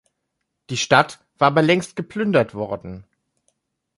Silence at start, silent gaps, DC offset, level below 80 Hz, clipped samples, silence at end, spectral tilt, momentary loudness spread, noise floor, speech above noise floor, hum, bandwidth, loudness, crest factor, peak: 0.7 s; none; under 0.1%; -56 dBFS; under 0.1%; 0.95 s; -5 dB/octave; 14 LU; -77 dBFS; 58 dB; none; 11.5 kHz; -20 LUFS; 22 dB; 0 dBFS